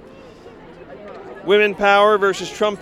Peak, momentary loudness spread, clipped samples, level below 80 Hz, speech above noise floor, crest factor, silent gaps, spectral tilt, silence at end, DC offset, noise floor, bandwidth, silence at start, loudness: -2 dBFS; 23 LU; under 0.1%; -54 dBFS; 25 dB; 18 dB; none; -4 dB/octave; 0 s; under 0.1%; -41 dBFS; 12.5 kHz; 0.45 s; -16 LUFS